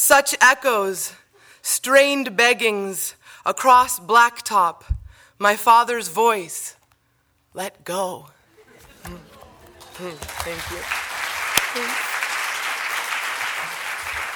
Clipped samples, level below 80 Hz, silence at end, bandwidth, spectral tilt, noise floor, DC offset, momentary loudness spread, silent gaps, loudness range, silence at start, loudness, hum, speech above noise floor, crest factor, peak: under 0.1%; -44 dBFS; 0 s; over 20 kHz; -1.5 dB/octave; -65 dBFS; under 0.1%; 17 LU; none; 15 LU; 0 s; -19 LUFS; none; 45 dB; 20 dB; 0 dBFS